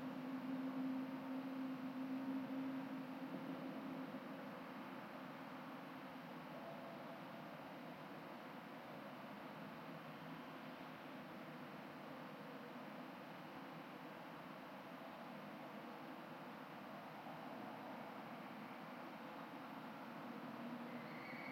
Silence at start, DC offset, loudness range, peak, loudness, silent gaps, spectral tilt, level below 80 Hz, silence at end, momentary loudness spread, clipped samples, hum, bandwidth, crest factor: 0 s; under 0.1%; 6 LU; -36 dBFS; -51 LUFS; none; -6.5 dB/octave; under -90 dBFS; 0 s; 7 LU; under 0.1%; none; 16.5 kHz; 16 dB